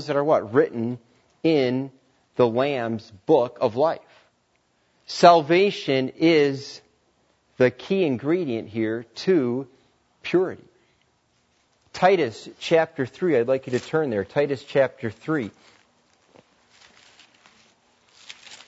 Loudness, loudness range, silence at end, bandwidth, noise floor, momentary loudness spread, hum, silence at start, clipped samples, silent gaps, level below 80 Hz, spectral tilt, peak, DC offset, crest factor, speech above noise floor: -22 LUFS; 7 LU; 0.1 s; 8 kHz; -67 dBFS; 15 LU; none; 0 s; under 0.1%; none; -70 dBFS; -6 dB/octave; -2 dBFS; under 0.1%; 22 dB; 46 dB